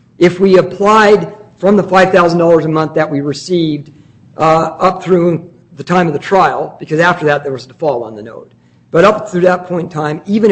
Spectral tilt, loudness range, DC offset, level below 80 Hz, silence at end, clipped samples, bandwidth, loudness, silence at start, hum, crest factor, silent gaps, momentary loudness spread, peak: -6.5 dB/octave; 4 LU; under 0.1%; -48 dBFS; 0 s; 0.1%; 8.6 kHz; -11 LUFS; 0.2 s; none; 12 dB; none; 11 LU; 0 dBFS